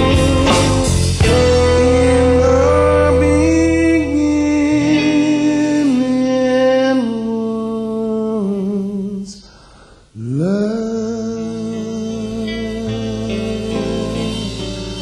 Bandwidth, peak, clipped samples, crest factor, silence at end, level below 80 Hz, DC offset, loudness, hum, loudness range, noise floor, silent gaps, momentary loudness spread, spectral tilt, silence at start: 12.5 kHz; -2 dBFS; under 0.1%; 12 dB; 0 s; -26 dBFS; under 0.1%; -15 LUFS; none; 9 LU; -44 dBFS; none; 11 LU; -6 dB/octave; 0 s